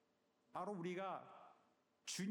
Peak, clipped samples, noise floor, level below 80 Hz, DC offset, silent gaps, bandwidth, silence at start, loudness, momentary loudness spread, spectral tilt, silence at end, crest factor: -36 dBFS; under 0.1%; -81 dBFS; under -90 dBFS; under 0.1%; none; 18 kHz; 0.55 s; -49 LUFS; 17 LU; -4 dB/octave; 0 s; 14 dB